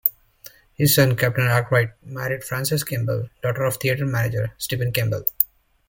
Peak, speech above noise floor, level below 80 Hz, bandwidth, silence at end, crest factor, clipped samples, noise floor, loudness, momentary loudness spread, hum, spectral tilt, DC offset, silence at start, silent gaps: 0 dBFS; 26 dB; -50 dBFS; 17 kHz; 0.45 s; 22 dB; under 0.1%; -47 dBFS; -22 LUFS; 9 LU; none; -5 dB/octave; under 0.1%; 0.05 s; none